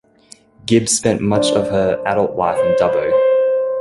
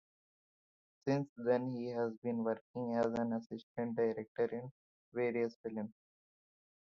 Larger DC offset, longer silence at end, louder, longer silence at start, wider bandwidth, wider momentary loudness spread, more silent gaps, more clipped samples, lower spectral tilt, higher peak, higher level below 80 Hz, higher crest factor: neither; second, 0 s vs 0.95 s; first, -16 LUFS vs -38 LUFS; second, 0.65 s vs 1.05 s; first, 11.5 kHz vs 7 kHz; second, 3 LU vs 10 LU; second, none vs 1.29-1.36 s, 2.17-2.22 s, 2.61-2.74 s, 3.46-3.50 s, 3.63-3.75 s, 4.28-4.35 s, 4.71-5.12 s, 5.56-5.64 s; neither; second, -4.5 dB/octave vs -7 dB/octave; first, -2 dBFS vs -20 dBFS; first, -48 dBFS vs -78 dBFS; about the same, 14 dB vs 18 dB